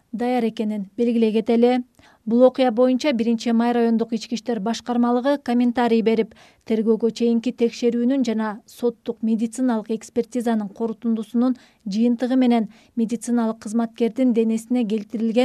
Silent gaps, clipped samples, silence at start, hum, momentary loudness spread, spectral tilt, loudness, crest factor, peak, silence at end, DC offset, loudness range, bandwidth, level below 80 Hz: none; under 0.1%; 0.15 s; none; 8 LU; -6 dB/octave; -21 LUFS; 16 dB; -4 dBFS; 0 s; under 0.1%; 4 LU; 12 kHz; -66 dBFS